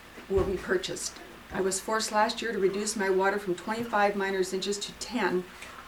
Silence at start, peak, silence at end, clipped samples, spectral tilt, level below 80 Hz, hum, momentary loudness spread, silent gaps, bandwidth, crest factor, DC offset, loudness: 0 s; -12 dBFS; 0 s; under 0.1%; -3.5 dB/octave; -52 dBFS; none; 8 LU; none; 19.5 kHz; 18 dB; under 0.1%; -29 LUFS